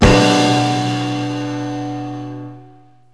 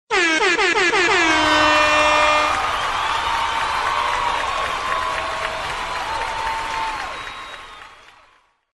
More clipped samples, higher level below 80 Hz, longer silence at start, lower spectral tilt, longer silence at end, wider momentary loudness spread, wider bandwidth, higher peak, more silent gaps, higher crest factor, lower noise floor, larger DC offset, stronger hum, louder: neither; first, -30 dBFS vs -42 dBFS; about the same, 0 s vs 0.1 s; first, -5 dB/octave vs -2 dB/octave; second, 0.5 s vs 0.85 s; first, 18 LU vs 12 LU; second, 11 kHz vs 12.5 kHz; first, 0 dBFS vs -4 dBFS; neither; about the same, 16 dB vs 16 dB; second, -46 dBFS vs -56 dBFS; first, 0.4% vs under 0.1%; neither; about the same, -17 LUFS vs -18 LUFS